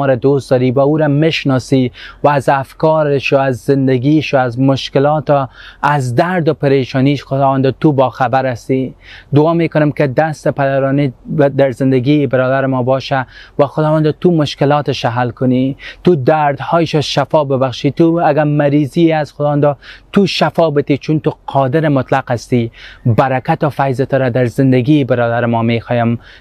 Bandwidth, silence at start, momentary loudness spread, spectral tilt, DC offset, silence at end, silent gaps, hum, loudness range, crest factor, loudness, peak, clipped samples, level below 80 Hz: 12 kHz; 0 s; 5 LU; -7.5 dB/octave; under 0.1%; 0.25 s; none; none; 1 LU; 12 dB; -13 LUFS; 0 dBFS; under 0.1%; -46 dBFS